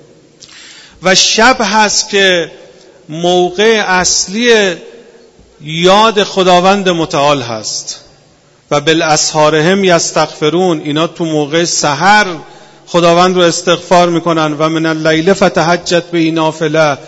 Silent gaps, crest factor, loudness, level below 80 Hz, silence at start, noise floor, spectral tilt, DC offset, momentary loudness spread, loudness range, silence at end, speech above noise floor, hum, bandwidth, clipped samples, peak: none; 10 dB; -10 LUFS; -46 dBFS; 0.55 s; -46 dBFS; -3.5 dB/octave; under 0.1%; 8 LU; 2 LU; 0 s; 36 dB; none; 11 kHz; 0.5%; 0 dBFS